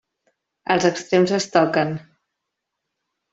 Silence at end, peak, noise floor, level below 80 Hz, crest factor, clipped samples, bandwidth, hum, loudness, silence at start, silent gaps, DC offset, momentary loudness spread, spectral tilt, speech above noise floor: 1.3 s; -2 dBFS; -81 dBFS; -64 dBFS; 20 dB; under 0.1%; 8 kHz; none; -20 LUFS; 0.7 s; none; under 0.1%; 11 LU; -5 dB/octave; 62 dB